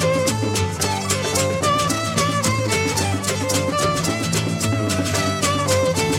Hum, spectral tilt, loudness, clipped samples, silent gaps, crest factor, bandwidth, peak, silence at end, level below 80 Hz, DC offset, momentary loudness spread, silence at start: none; -4 dB/octave; -20 LUFS; under 0.1%; none; 16 dB; 16.5 kHz; -4 dBFS; 0 s; -46 dBFS; under 0.1%; 3 LU; 0 s